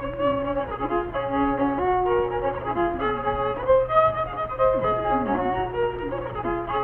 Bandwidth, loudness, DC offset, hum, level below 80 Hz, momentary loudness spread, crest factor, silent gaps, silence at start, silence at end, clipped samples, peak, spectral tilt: 4.1 kHz; -24 LUFS; under 0.1%; none; -42 dBFS; 7 LU; 16 dB; none; 0 s; 0 s; under 0.1%; -8 dBFS; -9.5 dB/octave